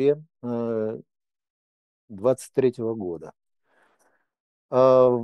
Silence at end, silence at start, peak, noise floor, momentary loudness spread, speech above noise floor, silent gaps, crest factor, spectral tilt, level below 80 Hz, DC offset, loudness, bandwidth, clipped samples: 0 s; 0 s; -6 dBFS; -67 dBFS; 15 LU; 46 dB; 1.50-2.08 s, 4.40-4.69 s; 20 dB; -7.5 dB/octave; -68 dBFS; under 0.1%; -24 LUFS; 12.5 kHz; under 0.1%